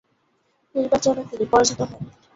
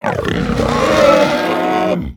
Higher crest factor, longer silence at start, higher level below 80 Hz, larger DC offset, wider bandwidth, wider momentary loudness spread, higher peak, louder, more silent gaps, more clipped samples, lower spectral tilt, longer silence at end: first, 20 dB vs 14 dB; first, 0.75 s vs 0.05 s; second, -52 dBFS vs -32 dBFS; neither; second, 8 kHz vs 18 kHz; first, 12 LU vs 7 LU; second, -4 dBFS vs 0 dBFS; second, -21 LUFS vs -14 LUFS; neither; neither; second, -3.5 dB/octave vs -5.5 dB/octave; first, 0.25 s vs 0.05 s